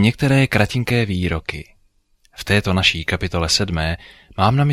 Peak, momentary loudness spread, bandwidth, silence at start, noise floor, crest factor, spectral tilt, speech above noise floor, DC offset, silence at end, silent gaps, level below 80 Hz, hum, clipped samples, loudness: -2 dBFS; 14 LU; 15 kHz; 0 s; -58 dBFS; 16 dB; -5 dB/octave; 40 dB; under 0.1%; 0 s; none; -36 dBFS; none; under 0.1%; -18 LUFS